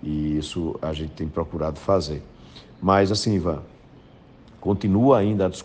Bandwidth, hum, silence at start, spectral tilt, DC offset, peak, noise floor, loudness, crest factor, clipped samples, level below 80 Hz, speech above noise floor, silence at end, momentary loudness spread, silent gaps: 9.6 kHz; none; 0.05 s; -6.5 dB/octave; under 0.1%; -4 dBFS; -49 dBFS; -23 LUFS; 20 dB; under 0.1%; -42 dBFS; 26 dB; 0 s; 12 LU; none